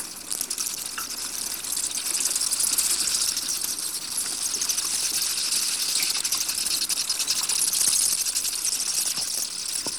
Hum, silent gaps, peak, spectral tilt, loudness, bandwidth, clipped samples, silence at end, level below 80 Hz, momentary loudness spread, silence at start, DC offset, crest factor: none; none; -8 dBFS; 2 dB/octave; -23 LUFS; over 20 kHz; under 0.1%; 0 s; -60 dBFS; 7 LU; 0 s; 0.1%; 18 dB